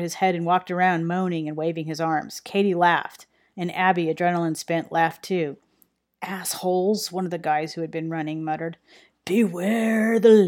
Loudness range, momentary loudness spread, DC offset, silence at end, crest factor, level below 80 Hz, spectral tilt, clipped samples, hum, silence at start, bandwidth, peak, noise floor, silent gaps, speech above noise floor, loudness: 4 LU; 10 LU; under 0.1%; 0 s; 18 dB; -74 dBFS; -5.5 dB/octave; under 0.1%; none; 0 s; 18 kHz; -4 dBFS; -65 dBFS; none; 42 dB; -24 LUFS